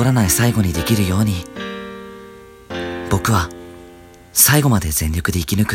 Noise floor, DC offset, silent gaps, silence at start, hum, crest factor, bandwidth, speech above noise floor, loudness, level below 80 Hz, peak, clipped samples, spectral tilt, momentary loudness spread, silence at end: -42 dBFS; under 0.1%; none; 0 s; none; 18 dB; 17 kHz; 26 dB; -17 LUFS; -34 dBFS; 0 dBFS; under 0.1%; -4.5 dB/octave; 21 LU; 0 s